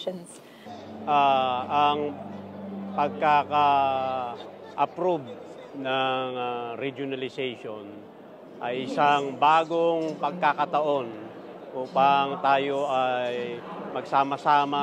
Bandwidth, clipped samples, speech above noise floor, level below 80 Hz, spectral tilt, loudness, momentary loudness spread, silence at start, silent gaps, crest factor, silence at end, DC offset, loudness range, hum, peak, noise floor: 10.5 kHz; under 0.1%; 21 dB; -82 dBFS; -5.5 dB/octave; -25 LUFS; 19 LU; 0 s; none; 18 dB; 0 s; under 0.1%; 5 LU; none; -8 dBFS; -46 dBFS